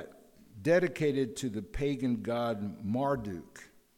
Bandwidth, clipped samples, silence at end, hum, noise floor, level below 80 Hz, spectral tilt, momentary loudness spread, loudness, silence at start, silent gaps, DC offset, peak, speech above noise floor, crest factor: 16.5 kHz; under 0.1%; 0.3 s; none; -56 dBFS; -52 dBFS; -6.5 dB/octave; 16 LU; -32 LUFS; 0 s; none; under 0.1%; -16 dBFS; 25 dB; 18 dB